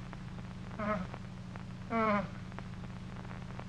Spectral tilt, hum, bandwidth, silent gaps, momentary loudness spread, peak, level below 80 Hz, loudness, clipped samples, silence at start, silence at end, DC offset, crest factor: -7.5 dB/octave; 50 Hz at -50 dBFS; 10.5 kHz; none; 13 LU; -20 dBFS; -52 dBFS; -39 LUFS; under 0.1%; 0 s; 0 s; under 0.1%; 18 dB